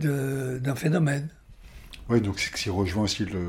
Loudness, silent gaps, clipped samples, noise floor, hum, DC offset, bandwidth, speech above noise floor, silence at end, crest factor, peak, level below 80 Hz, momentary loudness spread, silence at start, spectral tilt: -27 LUFS; none; under 0.1%; -46 dBFS; none; under 0.1%; 16.5 kHz; 20 dB; 0 s; 18 dB; -10 dBFS; -48 dBFS; 10 LU; 0 s; -5.5 dB/octave